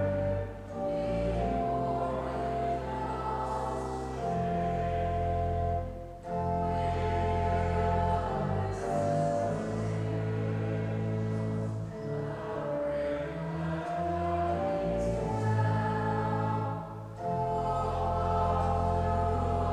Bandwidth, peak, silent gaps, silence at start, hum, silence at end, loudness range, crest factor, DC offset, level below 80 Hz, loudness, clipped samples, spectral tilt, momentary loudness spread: 10.5 kHz; -18 dBFS; none; 0 s; none; 0 s; 3 LU; 14 dB; under 0.1%; -44 dBFS; -32 LUFS; under 0.1%; -8 dB/octave; 6 LU